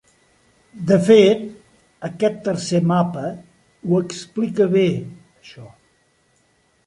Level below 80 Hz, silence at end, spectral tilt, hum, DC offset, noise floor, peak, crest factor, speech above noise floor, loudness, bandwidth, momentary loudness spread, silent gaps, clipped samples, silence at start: -60 dBFS; 1.2 s; -6.5 dB/octave; none; under 0.1%; -61 dBFS; -2 dBFS; 18 dB; 44 dB; -18 LUFS; 11.5 kHz; 20 LU; none; under 0.1%; 0.75 s